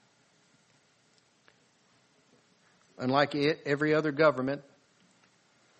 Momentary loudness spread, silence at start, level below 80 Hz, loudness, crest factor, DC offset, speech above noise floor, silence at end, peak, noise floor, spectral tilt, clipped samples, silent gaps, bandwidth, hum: 10 LU; 3 s; -74 dBFS; -28 LUFS; 22 dB; under 0.1%; 40 dB; 1.2 s; -10 dBFS; -67 dBFS; -6.5 dB/octave; under 0.1%; none; 8.4 kHz; none